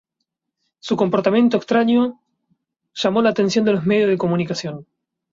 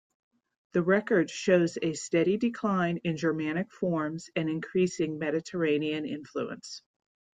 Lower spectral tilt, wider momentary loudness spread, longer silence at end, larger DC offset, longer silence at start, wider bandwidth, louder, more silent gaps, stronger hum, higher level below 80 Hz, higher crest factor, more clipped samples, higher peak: about the same, -6 dB/octave vs -6 dB/octave; about the same, 12 LU vs 10 LU; about the same, 0.5 s vs 0.6 s; neither; about the same, 0.85 s vs 0.75 s; second, 7.6 kHz vs 9.4 kHz; first, -18 LUFS vs -29 LUFS; neither; neither; first, -60 dBFS vs -70 dBFS; about the same, 16 dB vs 18 dB; neither; first, -4 dBFS vs -10 dBFS